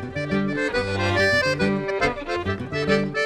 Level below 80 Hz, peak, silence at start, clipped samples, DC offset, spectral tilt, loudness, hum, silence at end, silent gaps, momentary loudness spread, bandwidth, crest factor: -44 dBFS; -6 dBFS; 0 s; under 0.1%; under 0.1%; -5.5 dB/octave; -23 LUFS; none; 0 s; none; 8 LU; 13.5 kHz; 18 dB